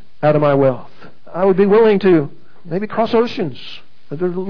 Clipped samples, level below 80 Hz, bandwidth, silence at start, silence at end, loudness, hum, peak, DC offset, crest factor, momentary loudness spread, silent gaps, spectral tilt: under 0.1%; -60 dBFS; 5.4 kHz; 0.2 s; 0 s; -15 LUFS; none; -4 dBFS; 4%; 14 dB; 18 LU; none; -9 dB/octave